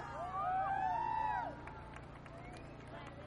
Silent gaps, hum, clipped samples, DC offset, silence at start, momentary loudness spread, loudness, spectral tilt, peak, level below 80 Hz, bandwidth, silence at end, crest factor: none; none; under 0.1%; under 0.1%; 0 s; 15 LU; -39 LUFS; -6 dB/octave; -28 dBFS; -60 dBFS; 11 kHz; 0 s; 14 dB